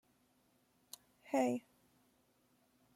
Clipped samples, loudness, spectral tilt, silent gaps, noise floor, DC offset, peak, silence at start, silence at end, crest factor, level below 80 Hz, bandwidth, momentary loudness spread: under 0.1%; -38 LUFS; -5 dB/octave; none; -75 dBFS; under 0.1%; -22 dBFS; 1.25 s; 1.35 s; 22 dB; -88 dBFS; 16.5 kHz; 20 LU